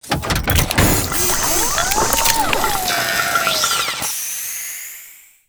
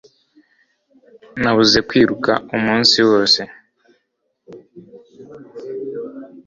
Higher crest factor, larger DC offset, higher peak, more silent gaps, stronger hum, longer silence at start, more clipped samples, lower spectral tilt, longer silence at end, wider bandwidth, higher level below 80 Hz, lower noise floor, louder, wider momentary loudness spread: about the same, 18 dB vs 20 dB; neither; about the same, 0 dBFS vs 0 dBFS; neither; neither; second, 0.05 s vs 1.35 s; neither; second, -2 dB/octave vs -3.5 dB/octave; first, 0.3 s vs 0.05 s; first, over 20 kHz vs 7.6 kHz; first, -30 dBFS vs -52 dBFS; second, -42 dBFS vs -70 dBFS; about the same, -16 LUFS vs -15 LUFS; second, 9 LU vs 21 LU